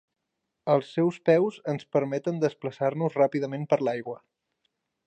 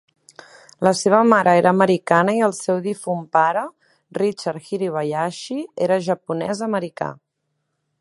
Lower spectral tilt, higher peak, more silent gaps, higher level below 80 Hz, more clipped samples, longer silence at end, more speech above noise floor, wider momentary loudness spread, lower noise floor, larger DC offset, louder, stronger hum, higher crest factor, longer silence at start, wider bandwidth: first, -7.5 dB/octave vs -5.5 dB/octave; second, -10 dBFS vs 0 dBFS; neither; second, -74 dBFS vs -68 dBFS; neither; about the same, 0.9 s vs 0.9 s; about the same, 56 dB vs 55 dB; second, 11 LU vs 14 LU; first, -82 dBFS vs -74 dBFS; neither; second, -27 LUFS vs -20 LUFS; neither; about the same, 18 dB vs 20 dB; second, 0.65 s vs 0.8 s; second, 8.8 kHz vs 11.5 kHz